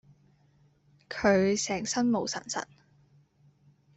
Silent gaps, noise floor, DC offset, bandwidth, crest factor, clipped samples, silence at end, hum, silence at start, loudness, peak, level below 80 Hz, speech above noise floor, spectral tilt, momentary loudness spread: none; -65 dBFS; under 0.1%; 8.4 kHz; 22 dB; under 0.1%; 1.35 s; none; 1.1 s; -28 LUFS; -10 dBFS; -64 dBFS; 37 dB; -4 dB/octave; 13 LU